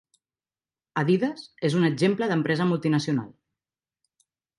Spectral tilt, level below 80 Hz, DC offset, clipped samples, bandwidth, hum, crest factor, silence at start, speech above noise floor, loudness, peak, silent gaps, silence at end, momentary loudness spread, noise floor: -7 dB/octave; -70 dBFS; under 0.1%; under 0.1%; 11.5 kHz; none; 16 dB; 0.95 s; over 66 dB; -25 LUFS; -10 dBFS; none; 1.3 s; 7 LU; under -90 dBFS